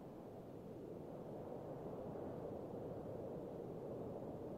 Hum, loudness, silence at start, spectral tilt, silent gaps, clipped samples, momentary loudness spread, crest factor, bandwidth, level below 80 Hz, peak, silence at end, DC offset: none; -50 LUFS; 0 s; -9 dB/octave; none; under 0.1%; 5 LU; 14 dB; 15.5 kHz; -70 dBFS; -36 dBFS; 0 s; under 0.1%